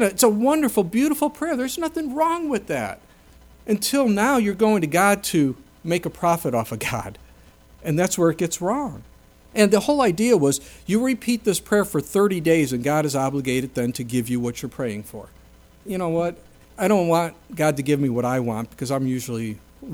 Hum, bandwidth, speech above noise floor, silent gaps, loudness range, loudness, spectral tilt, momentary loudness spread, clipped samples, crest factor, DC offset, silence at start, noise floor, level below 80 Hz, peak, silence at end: none; over 20 kHz; 28 dB; none; 5 LU; -22 LUFS; -5 dB/octave; 11 LU; under 0.1%; 18 dB; under 0.1%; 0 s; -50 dBFS; -52 dBFS; -4 dBFS; 0 s